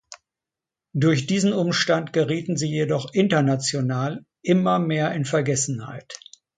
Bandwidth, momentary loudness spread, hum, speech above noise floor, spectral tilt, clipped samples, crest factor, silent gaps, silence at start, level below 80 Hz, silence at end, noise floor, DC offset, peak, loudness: 9.6 kHz; 12 LU; none; 66 dB; -5 dB/octave; under 0.1%; 18 dB; none; 0.1 s; -64 dBFS; 0.4 s; -88 dBFS; under 0.1%; -6 dBFS; -22 LUFS